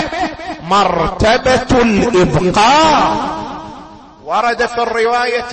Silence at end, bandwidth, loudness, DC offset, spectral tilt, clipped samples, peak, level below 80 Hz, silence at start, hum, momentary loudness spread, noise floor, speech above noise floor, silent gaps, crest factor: 0 s; 8.8 kHz; -13 LUFS; under 0.1%; -4.5 dB/octave; under 0.1%; -2 dBFS; -32 dBFS; 0 s; none; 15 LU; -35 dBFS; 23 dB; none; 10 dB